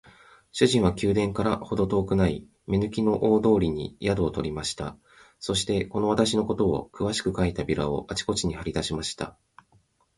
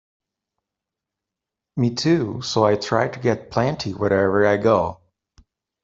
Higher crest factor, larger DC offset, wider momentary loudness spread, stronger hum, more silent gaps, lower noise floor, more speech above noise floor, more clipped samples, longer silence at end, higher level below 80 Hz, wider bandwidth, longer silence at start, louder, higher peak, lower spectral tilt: about the same, 22 dB vs 20 dB; neither; first, 9 LU vs 6 LU; neither; neither; second, -64 dBFS vs -86 dBFS; second, 39 dB vs 66 dB; neither; about the same, 0.85 s vs 0.9 s; first, -44 dBFS vs -56 dBFS; first, 11.5 kHz vs 7.8 kHz; second, 0.55 s vs 1.75 s; second, -26 LUFS vs -20 LUFS; about the same, -4 dBFS vs -2 dBFS; about the same, -5.5 dB/octave vs -6 dB/octave